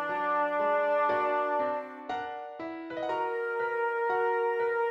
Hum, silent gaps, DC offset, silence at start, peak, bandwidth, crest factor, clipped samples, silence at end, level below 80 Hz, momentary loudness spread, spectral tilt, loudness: none; none; under 0.1%; 0 s; -16 dBFS; 7.4 kHz; 14 dB; under 0.1%; 0 s; -76 dBFS; 11 LU; -5.5 dB/octave; -30 LUFS